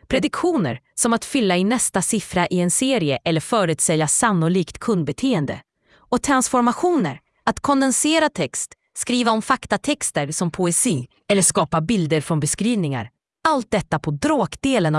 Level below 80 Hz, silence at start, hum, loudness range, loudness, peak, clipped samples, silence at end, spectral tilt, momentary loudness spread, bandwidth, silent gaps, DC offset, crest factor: -50 dBFS; 0.1 s; none; 2 LU; -20 LUFS; -2 dBFS; under 0.1%; 0 s; -4 dB/octave; 8 LU; 12 kHz; none; under 0.1%; 18 dB